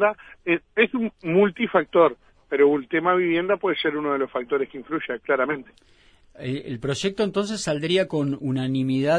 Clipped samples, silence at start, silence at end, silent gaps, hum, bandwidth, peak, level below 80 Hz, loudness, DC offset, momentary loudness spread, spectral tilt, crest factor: under 0.1%; 0 s; 0 s; none; none; 10.5 kHz; -4 dBFS; -60 dBFS; -23 LUFS; under 0.1%; 9 LU; -5.5 dB/octave; 18 dB